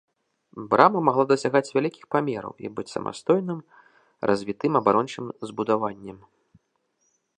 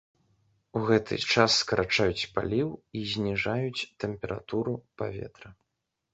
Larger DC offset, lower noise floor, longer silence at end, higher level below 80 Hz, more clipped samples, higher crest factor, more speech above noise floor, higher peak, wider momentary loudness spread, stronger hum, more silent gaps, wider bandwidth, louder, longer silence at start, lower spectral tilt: neither; second, -72 dBFS vs -83 dBFS; first, 1.2 s vs 0.6 s; second, -66 dBFS vs -54 dBFS; neither; about the same, 24 dB vs 26 dB; second, 48 dB vs 54 dB; first, 0 dBFS vs -4 dBFS; first, 16 LU vs 13 LU; neither; neither; first, 10 kHz vs 8.2 kHz; first, -24 LUFS vs -28 LUFS; second, 0.55 s vs 0.75 s; first, -6.5 dB/octave vs -4.5 dB/octave